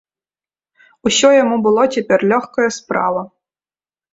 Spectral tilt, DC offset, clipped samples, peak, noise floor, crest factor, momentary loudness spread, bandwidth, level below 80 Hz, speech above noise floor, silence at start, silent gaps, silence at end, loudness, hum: -3.5 dB/octave; under 0.1%; under 0.1%; -2 dBFS; under -90 dBFS; 16 dB; 10 LU; 8 kHz; -58 dBFS; over 76 dB; 1.05 s; none; 0.85 s; -15 LUFS; none